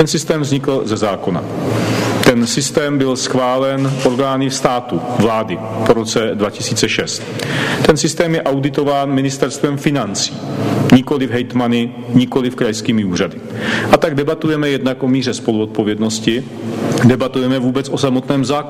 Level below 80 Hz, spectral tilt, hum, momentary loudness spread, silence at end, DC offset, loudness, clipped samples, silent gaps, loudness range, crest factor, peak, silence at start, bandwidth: -44 dBFS; -5 dB/octave; none; 6 LU; 0 s; under 0.1%; -16 LUFS; under 0.1%; none; 1 LU; 16 dB; 0 dBFS; 0 s; 15.5 kHz